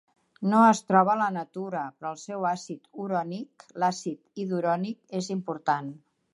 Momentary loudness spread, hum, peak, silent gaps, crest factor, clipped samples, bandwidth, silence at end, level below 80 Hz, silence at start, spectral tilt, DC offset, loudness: 16 LU; none; -6 dBFS; none; 22 dB; under 0.1%; 11.5 kHz; 0.35 s; -80 dBFS; 0.4 s; -6 dB/octave; under 0.1%; -27 LUFS